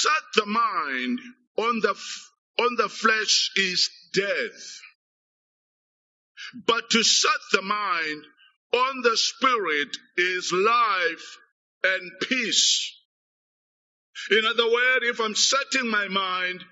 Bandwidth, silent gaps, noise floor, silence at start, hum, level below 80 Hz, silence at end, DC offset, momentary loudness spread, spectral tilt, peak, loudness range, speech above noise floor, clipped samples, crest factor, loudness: 8 kHz; 1.47-1.55 s, 2.38-2.54 s, 4.95-6.35 s, 8.56-8.70 s, 11.52-11.81 s, 13.05-14.13 s; under -90 dBFS; 0 s; none; -82 dBFS; 0.1 s; under 0.1%; 14 LU; 0.5 dB/octave; -2 dBFS; 3 LU; over 66 dB; under 0.1%; 24 dB; -23 LUFS